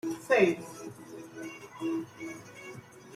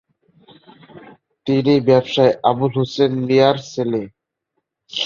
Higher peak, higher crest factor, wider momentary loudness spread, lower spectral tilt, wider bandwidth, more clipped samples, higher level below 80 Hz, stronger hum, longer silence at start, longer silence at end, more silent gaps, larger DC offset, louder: second, -10 dBFS vs -2 dBFS; about the same, 22 dB vs 18 dB; first, 21 LU vs 11 LU; second, -5 dB/octave vs -6.5 dB/octave; first, 15.5 kHz vs 7.2 kHz; neither; second, -74 dBFS vs -60 dBFS; neither; second, 0.05 s vs 0.95 s; about the same, 0 s vs 0 s; neither; neither; second, -30 LUFS vs -17 LUFS